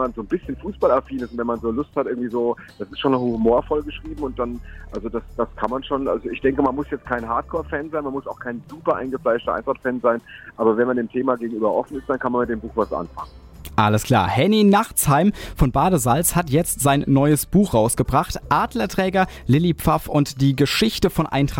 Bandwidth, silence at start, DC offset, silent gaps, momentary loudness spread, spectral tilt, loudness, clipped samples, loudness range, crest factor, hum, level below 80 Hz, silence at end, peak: 17 kHz; 0 s; under 0.1%; none; 12 LU; -5.5 dB/octave; -21 LUFS; under 0.1%; 6 LU; 16 dB; none; -38 dBFS; 0 s; -6 dBFS